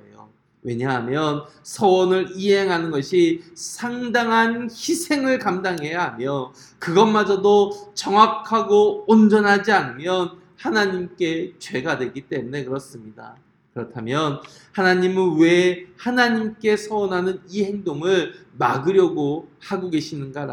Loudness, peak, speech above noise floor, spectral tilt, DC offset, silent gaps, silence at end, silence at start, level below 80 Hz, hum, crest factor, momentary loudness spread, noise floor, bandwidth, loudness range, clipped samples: -20 LUFS; 0 dBFS; 30 dB; -5 dB/octave; under 0.1%; none; 0 s; 0.65 s; -64 dBFS; none; 20 dB; 14 LU; -50 dBFS; 17.5 kHz; 8 LU; under 0.1%